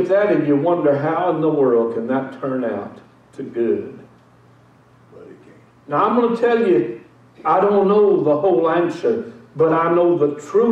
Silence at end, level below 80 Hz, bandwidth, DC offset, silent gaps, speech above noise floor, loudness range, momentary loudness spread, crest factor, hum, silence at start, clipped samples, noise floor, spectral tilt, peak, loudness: 0 s; -64 dBFS; 8.4 kHz; under 0.1%; none; 33 dB; 10 LU; 11 LU; 12 dB; none; 0 s; under 0.1%; -50 dBFS; -8 dB/octave; -6 dBFS; -18 LUFS